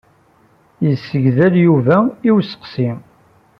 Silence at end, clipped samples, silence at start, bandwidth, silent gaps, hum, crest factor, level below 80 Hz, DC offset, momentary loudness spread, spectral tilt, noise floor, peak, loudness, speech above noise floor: 0.6 s; under 0.1%; 0.8 s; 5.8 kHz; none; none; 14 dB; -56 dBFS; under 0.1%; 10 LU; -10 dB/octave; -53 dBFS; -2 dBFS; -15 LUFS; 39 dB